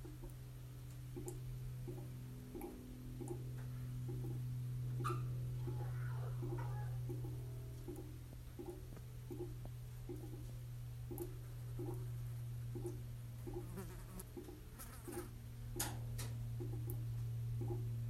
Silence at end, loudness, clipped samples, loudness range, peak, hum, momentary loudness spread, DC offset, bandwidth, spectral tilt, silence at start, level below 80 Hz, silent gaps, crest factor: 0 s; -47 LUFS; under 0.1%; 6 LU; -26 dBFS; none; 9 LU; under 0.1%; 16 kHz; -6.5 dB/octave; 0 s; -56 dBFS; none; 20 dB